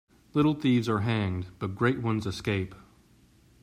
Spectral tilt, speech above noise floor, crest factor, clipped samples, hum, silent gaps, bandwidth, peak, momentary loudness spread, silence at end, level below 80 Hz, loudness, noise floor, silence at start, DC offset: -7 dB/octave; 33 dB; 18 dB; under 0.1%; none; none; 14.5 kHz; -12 dBFS; 8 LU; 0.85 s; -58 dBFS; -28 LUFS; -60 dBFS; 0.35 s; under 0.1%